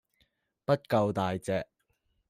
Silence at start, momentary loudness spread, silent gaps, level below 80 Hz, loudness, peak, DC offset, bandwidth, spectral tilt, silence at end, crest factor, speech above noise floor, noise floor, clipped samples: 0.7 s; 11 LU; none; -66 dBFS; -30 LUFS; -12 dBFS; under 0.1%; 15 kHz; -7 dB/octave; 0.65 s; 20 dB; 47 dB; -75 dBFS; under 0.1%